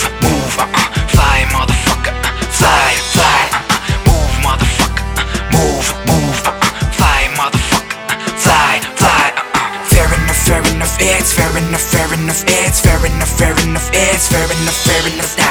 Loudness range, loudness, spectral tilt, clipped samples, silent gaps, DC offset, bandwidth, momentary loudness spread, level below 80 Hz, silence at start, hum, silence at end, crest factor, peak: 2 LU; -12 LUFS; -3.5 dB/octave; under 0.1%; none; under 0.1%; over 20 kHz; 5 LU; -20 dBFS; 0 s; none; 0 s; 12 dB; 0 dBFS